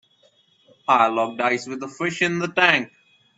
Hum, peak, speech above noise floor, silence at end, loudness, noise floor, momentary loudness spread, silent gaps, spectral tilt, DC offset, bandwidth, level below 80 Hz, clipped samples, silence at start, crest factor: none; 0 dBFS; 39 dB; 0.5 s; -20 LUFS; -60 dBFS; 13 LU; none; -4 dB/octave; under 0.1%; 8.2 kHz; -70 dBFS; under 0.1%; 0.9 s; 22 dB